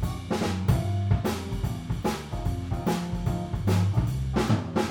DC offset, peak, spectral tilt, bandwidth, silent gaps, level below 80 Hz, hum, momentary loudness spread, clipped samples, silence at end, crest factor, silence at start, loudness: under 0.1%; -10 dBFS; -6.5 dB/octave; 18 kHz; none; -36 dBFS; none; 6 LU; under 0.1%; 0 s; 16 dB; 0 s; -28 LUFS